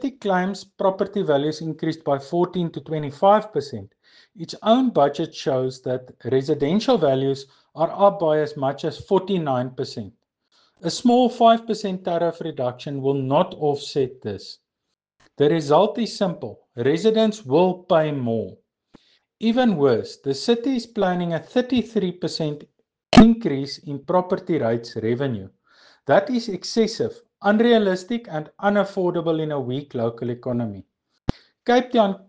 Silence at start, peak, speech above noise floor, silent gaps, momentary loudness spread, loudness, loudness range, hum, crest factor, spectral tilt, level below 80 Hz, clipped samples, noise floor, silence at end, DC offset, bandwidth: 0 s; -2 dBFS; 59 dB; none; 13 LU; -22 LUFS; 4 LU; none; 20 dB; -6.5 dB/octave; -48 dBFS; under 0.1%; -80 dBFS; 0.1 s; under 0.1%; 9.4 kHz